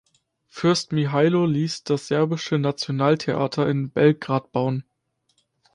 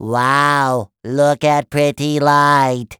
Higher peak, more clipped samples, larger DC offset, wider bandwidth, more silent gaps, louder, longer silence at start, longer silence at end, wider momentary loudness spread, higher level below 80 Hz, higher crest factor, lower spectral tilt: second, -4 dBFS vs 0 dBFS; neither; neither; second, 11 kHz vs over 20 kHz; neither; second, -22 LUFS vs -15 LUFS; first, 0.55 s vs 0 s; first, 0.95 s vs 0.05 s; about the same, 6 LU vs 6 LU; second, -62 dBFS vs -54 dBFS; about the same, 18 dB vs 14 dB; about the same, -6.5 dB/octave vs -5.5 dB/octave